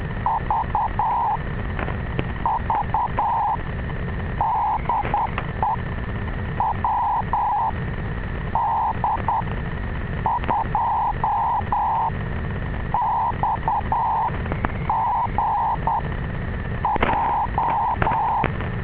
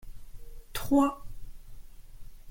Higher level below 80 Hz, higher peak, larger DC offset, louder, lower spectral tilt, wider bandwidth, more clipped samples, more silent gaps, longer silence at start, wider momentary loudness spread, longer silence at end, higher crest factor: first, -32 dBFS vs -44 dBFS; first, 0 dBFS vs -12 dBFS; neither; first, -23 LUFS vs -28 LUFS; first, -10.5 dB/octave vs -5.5 dB/octave; second, 4 kHz vs 17 kHz; neither; neither; about the same, 0 s vs 0 s; second, 7 LU vs 26 LU; about the same, 0 s vs 0 s; about the same, 22 dB vs 20 dB